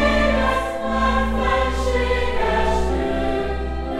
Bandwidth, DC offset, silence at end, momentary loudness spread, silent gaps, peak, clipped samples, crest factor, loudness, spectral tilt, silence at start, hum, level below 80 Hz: 12.5 kHz; under 0.1%; 0 s; 5 LU; none; -4 dBFS; under 0.1%; 14 dB; -21 LUFS; -6 dB/octave; 0 s; none; -26 dBFS